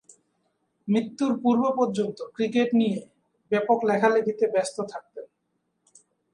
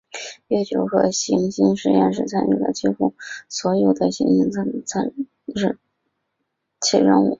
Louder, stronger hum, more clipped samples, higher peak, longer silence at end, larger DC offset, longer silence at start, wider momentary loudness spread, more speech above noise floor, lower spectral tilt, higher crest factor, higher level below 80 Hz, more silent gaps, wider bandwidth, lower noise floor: second, -25 LUFS vs -20 LUFS; neither; neither; second, -8 dBFS vs -2 dBFS; first, 1.1 s vs 0.05 s; neither; first, 0.85 s vs 0.15 s; about the same, 13 LU vs 11 LU; second, 52 dB vs 56 dB; about the same, -6 dB/octave vs -5 dB/octave; about the same, 18 dB vs 18 dB; second, -74 dBFS vs -58 dBFS; neither; first, 11 kHz vs 7.8 kHz; about the same, -76 dBFS vs -76 dBFS